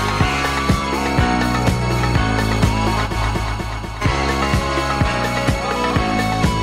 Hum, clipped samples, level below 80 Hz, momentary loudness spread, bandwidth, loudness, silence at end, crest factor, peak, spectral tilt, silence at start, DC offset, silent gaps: none; under 0.1%; -26 dBFS; 3 LU; 16 kHz; -18 LUFS; 0 s; 16 dB; -2 dBFS; -5.5 dB/octave; 0 s; under 0.1%; none